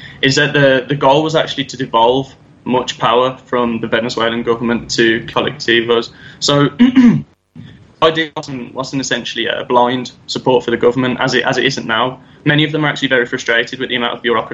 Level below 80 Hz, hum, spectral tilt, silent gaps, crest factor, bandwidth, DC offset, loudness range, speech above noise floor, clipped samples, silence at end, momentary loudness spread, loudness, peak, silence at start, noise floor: -50 dBFS; none; -4.5 dB/octave; none; 14 dB; 8.2 kHz; under 0.1%; 2 LU; 23 dB; under 0.1%; 0 s; 8 LU; -14 LUFS; 0 dBFS; 0 s; -37 dBFS